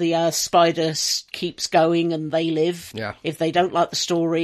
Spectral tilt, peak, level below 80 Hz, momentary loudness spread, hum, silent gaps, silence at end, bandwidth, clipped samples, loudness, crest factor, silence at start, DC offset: -4 dB/octave; -4 dBFS; -60 dBFS; 11 LU; none; none; 0 s; 14 kHz; under 0.1%; -21 LUFS; 18 dB; 0 s; under 0.1%